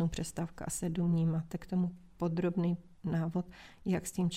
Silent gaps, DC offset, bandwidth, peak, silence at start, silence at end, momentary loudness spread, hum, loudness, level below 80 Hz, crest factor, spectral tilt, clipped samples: none; under 0.1%; 15 kHz; -20 dBFS; 0 s; 0 s; 7 LU; none; -35 LUFS; -56 dBFS; 14 dB; -6.5 dB/octave; under 0.1%